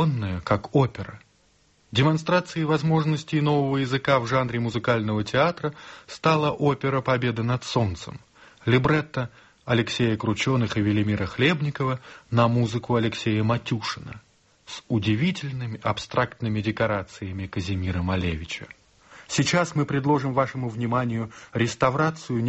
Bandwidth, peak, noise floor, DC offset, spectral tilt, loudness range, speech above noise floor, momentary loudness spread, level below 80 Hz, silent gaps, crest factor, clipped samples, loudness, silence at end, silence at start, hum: 8.2 kHz; -6 dBFS; -62 dBFS; under 0.1%; -6 dB/octave; 4 LU; 38 dB; 10 LU; -50 dBFS; none; 18 dB; under 0.1%; -24 LUFS; 0 s; 0 s; none